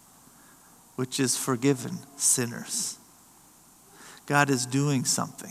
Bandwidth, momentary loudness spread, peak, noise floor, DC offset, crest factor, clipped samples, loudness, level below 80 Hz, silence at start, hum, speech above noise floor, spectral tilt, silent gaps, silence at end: 15 kHz; 16 LU; -6 dBFS; -56 dBFS; under 0.1%; 24 dB; under 0.1%; -26 LUFS; -74 dBFS; 1 s; none; 29 dB; -3.5 dB/octave; none; 0 s